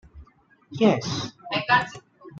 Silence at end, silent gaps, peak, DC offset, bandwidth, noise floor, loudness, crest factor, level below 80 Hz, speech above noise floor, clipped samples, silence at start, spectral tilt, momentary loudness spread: 0 s; none; -6 dBFS; under 0.1%; 7.8 kHz; -56 dBFS; -23 LUFS; 20 dB; -56 dBFS; 34 dB; under 0.1%; 0.15 s; -5 dB/octave; 17 LU